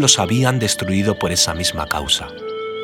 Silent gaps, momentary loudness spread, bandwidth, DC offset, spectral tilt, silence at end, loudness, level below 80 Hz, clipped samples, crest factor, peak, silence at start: none; 10 LU; over 20 kHz; under 0.1%; -3 dB/octave; 0 s; -17 LUFS; -40 dBFS; under 0.1%; 18 dB; 0 dBFS; 0 s